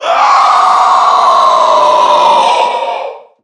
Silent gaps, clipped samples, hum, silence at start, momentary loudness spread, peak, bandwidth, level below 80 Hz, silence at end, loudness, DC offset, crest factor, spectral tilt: none; 0.2%; none; 0 s; 9 LU; 0 dBFS; 10.5 kHz; -74 dBFS; 0.25 s; -8 LUFS; under 0.1%; 8 dB; -1 dB/octave